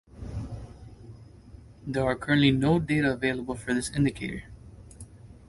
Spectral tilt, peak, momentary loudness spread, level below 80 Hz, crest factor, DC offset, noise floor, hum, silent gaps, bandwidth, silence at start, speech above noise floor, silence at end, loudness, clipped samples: -6 dB/octave; -8 dBFS; 25 LU; -48 dBFS; 20 dB; under 0.1%; -49 dBFS; none; none; 11.5 kHz; 0.15 s; 23 dB; 0.1 s; -27 LUFS; under 0.1%